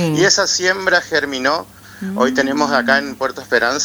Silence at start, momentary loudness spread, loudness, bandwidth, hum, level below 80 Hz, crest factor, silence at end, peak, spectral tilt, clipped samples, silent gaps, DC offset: 0 s; 10 LU; -16 LUFS; over 20 kHz; none; -54 dBFS; 16 dB; 0 s; 0 dBFS; -3 dB/octave; under 0.1%; none; under 0.1%